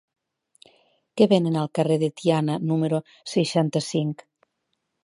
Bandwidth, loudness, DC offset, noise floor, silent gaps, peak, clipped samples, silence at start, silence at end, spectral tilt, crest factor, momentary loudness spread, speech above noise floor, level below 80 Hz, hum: 11.5 kHz; -23 LUFS; under 0.1%; -77 dBFS; none; -4 dBFS; under 0.1%; 1.15 s; 0.9 s; -6.5 dB/octave; 20 dB; 9 LU; 55 dB; -72 dBFS; none